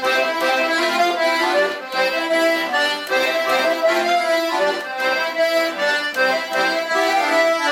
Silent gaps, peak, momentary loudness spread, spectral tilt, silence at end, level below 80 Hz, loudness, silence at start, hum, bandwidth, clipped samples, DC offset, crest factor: none; -6 dBFS; 3 LU; -1.5 dB/octave; 0 s; -72 dBFS; -18 LUFS; 0 s; none; 16.5 kHz; under 0.1%; under 0.1%; 14 dB